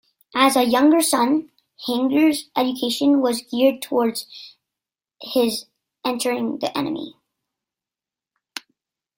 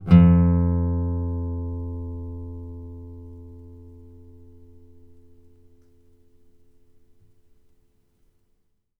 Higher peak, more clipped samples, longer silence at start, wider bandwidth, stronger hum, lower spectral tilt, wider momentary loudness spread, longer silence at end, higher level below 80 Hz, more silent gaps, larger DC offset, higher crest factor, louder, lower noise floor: about the same, -4 dBFS vs -2 dBFS; neither; first, 0.35 s vs 0 s; first, 16.5 kHz vs 3.9 kHz; neither; second, -3 dB/octave vs -11.5 dB/octave; second, 20 LU vs 28 LU; second, 2.1 s vs 5.05 s; second, -68 dBFS vs -38 dBFS; neither; neither; second, 18 dB vs 24 dB; about the same, -20 LUFS vs -22 LUFS; first, -90 dBFS vs -67 dBFS